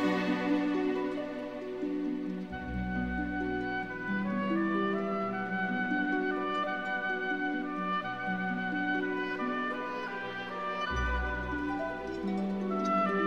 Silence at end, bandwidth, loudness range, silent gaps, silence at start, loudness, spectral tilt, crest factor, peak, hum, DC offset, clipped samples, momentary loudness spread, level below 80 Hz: 0 s; 8.2 kHz; 3 LU; none; 0 s; -33 LUFS; -7 dB/octave; 14 dB; -18 dBFS; none; 0.1%; under 0.1%; 7 LU; -48 dBFS